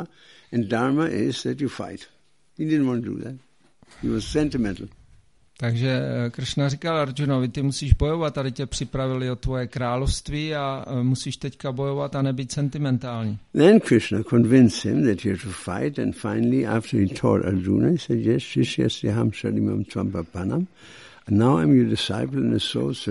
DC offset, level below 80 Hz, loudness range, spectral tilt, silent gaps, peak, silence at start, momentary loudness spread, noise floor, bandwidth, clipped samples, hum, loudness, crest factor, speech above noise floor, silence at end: 0.1%; -40 dBFS; 7 LU; -6.5 dB/octave; none; -2 dBFS; 0 s; 11 LU; -56 dBFS; 11.5 kHz; under 0.1%; none; -23 LUFS; 22 dB; 34 dB; 0 s